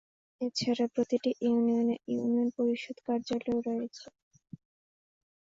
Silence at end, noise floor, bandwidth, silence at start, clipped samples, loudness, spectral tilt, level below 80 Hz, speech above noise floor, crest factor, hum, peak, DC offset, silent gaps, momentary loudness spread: 1.4 s; under -90 dBFS; 7.6 kHz; 0.4 s; under 0.1%; -31 LUFS; -5.5 dB/octave; -72 dBFS; over 60 dB; 14 dB; none; -18 dBFS; under 0.1%; none; 8 LU